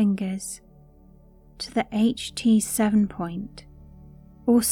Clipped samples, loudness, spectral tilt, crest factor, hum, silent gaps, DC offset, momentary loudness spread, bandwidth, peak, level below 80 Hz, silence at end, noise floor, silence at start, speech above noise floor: under 0.1%; -24 LUFS; -5 dB/octave; 16 dB; none; none; under 0.1%; 15 LU; 17.5 kHz; -8 dBFS; -52 dBFS; 0 s; -52 dBFS; 0 s; 28 dB